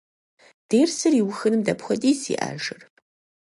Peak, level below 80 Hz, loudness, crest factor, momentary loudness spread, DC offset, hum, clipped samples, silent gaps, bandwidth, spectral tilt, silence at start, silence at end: -8 dBFS; -68 dBFS; -23 LUFS; 16 dB; 11 LU; under 0.1%; none; under 0.1%; none; 11.5 kHz; -4.5 dB/octave; 0.7 s; 0.7 s